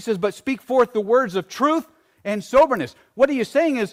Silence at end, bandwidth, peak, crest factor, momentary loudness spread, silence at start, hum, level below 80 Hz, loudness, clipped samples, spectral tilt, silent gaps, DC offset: 0.05 s; 15.5 kHz; -6 dBFS; 14 dB; 11 LU; 0 s; none; -56 dBFS; -20 LUFS; under 0.1%; -5.5 dB/octave; none; under 0.1%